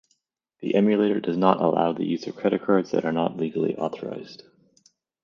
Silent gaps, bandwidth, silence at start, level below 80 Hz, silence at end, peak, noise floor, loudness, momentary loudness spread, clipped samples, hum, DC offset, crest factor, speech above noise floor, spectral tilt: none; 7 kHz; 0.6 s; -68 dBFS; 0.9 s; -2 dBFS; -72 dBFS; -24 LUFS; 14 LU; under 0.1%; none; under 0.1%; 22 dB; 48 dB; -7.5 dB/octave